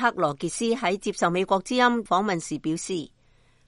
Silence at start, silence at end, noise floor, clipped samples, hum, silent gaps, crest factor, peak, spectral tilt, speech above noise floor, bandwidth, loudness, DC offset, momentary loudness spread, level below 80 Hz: 0 s; 0.6 s; -60 dBFS; under 0.1%; none; none; 18 dB; -8 dBFS; -4 dB/octave; 35 dB; 11.5 kHz; -25 LUFS; under 0.1%; 8 LU; -58 dBFS